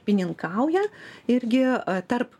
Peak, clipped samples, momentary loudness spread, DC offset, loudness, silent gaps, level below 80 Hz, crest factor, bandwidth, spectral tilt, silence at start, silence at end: -8 dBFS; under 0.1%; 6 LU; under 0.1%; -25 LUFS; none; -70 dBFS; 16 dB; 11 kHz; -7 dB/octave; 0.05 s; 0.15 s